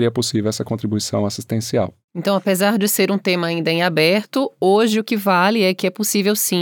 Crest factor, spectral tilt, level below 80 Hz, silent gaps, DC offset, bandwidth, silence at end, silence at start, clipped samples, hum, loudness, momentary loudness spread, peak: 14 dB; -4.5 dB/octave; -68 dBFS; 2.04-2.08 s; under 0.1%; over 20 kHz; 0 s; 0 s; under 0.1%; none; -18 LUFS; 7 LU; -4 dBFS